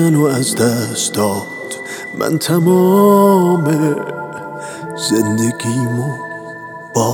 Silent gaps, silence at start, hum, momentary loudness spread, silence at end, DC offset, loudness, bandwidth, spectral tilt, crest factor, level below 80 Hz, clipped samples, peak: none; 0 s; none; 17 LU; 0 s; under 0.1%; -15 LUFS; 19 kHz; -5.5 dB/octave; 14 dB; -62 dBFS; under 0.1%; 0 dBFS